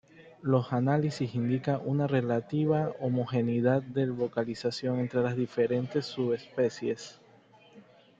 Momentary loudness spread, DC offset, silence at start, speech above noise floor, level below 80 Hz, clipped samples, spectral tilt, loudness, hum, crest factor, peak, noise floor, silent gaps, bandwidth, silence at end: 5 LU; under 0.1%; 0.2 s; 29 dB; -68 dBFS; under 0.1%; -7.5 dB/octave; -30 LUFS; none; 18 dB; -12 dBFS; -58 dBFS; none; 7.8 kHz; 0.4 s